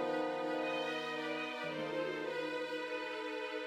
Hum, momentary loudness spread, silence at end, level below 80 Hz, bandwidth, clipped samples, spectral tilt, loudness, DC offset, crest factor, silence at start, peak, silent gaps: none; 3 LU; 0 s; -82 dBFS; 14.5 kHz; under 0.1%; -4.5 dB/octave; -39 LUFS; under 0.1%; 14 dB; 0 s; -26 dBFS; none